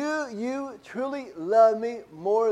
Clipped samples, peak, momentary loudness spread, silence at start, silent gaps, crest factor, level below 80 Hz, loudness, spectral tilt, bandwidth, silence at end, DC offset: under 0.1%; -10 dBFS; 14 LU; 0 s; none; 16 dB; -72 dBFS; -26 LUFS; -5 dB/octave; 9.8 kHz; 0 s; under 0.1%